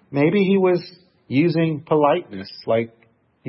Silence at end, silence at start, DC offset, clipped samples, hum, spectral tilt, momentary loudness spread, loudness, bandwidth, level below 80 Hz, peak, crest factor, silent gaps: 0 s; 0.1 s; under 0.1%; under 0.1%; none; -12 dB/octave; 15 LU; -20 LUFS; 5.8 kHz; -66 dBFS; -4 dBFS; 16 dB; none